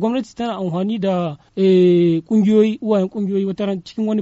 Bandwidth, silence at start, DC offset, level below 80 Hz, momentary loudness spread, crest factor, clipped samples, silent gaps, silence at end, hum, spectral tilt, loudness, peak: 8 kHz; 0 s; under 0.1%; -60 dBFS; 10 LU; 14 dB; under 0.1%; none; 0 s; none; -7.5 dB/octave; -18 LUFS; -4 dBFS